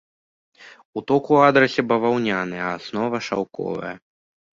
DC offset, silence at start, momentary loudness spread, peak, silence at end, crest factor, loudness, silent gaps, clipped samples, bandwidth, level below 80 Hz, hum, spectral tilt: under 0.1%; 0.6 s; 17 LU; -2 dBFS; 0.55 s; 20 dB; -21 LUFS; 0.85-0.93 s; under 0.1%; 7.6 kHz; -62 dBFS; none; -6 dB/octave